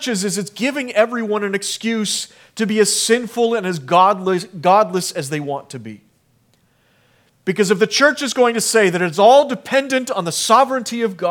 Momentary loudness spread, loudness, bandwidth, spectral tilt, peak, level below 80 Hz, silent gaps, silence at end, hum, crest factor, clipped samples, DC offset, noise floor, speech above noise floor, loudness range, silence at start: 10 LU; -17 LUFS; 18.5 kHz; -3.5 dB/octave; 0 dBFS; -72 dBFS; none; 0 s; none; 18 dB; under 0.1%; under 0.1%; -59 dBFS; 42 dB; 6 LU; 0 s